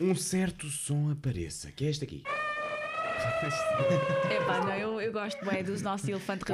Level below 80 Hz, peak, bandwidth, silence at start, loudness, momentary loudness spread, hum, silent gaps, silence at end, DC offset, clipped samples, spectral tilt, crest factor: -58 dBFS; -16 dBFS; 15 kHz; 0 s; -31 LUFS; 7 LU; none; none; 0 s; under 0.1%; under 0.1%; -5 dB/octave; 16 dB